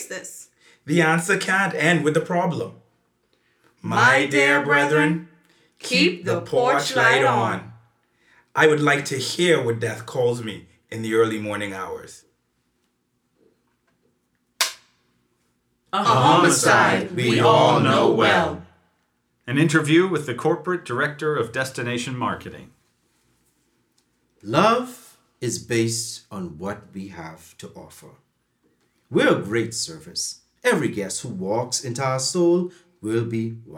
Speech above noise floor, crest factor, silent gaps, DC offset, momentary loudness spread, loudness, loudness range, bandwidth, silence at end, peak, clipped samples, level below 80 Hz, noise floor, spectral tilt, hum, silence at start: 50 dB; 20 dB; none; under 0.1%; 18 LU; -20 LUFS; 11 LU; 17.5 kHz; 0 s; -2 dBFS; under 0.1%; -64 dBFS; -71 dBFS; -4.5 dB/octave; none; 0 s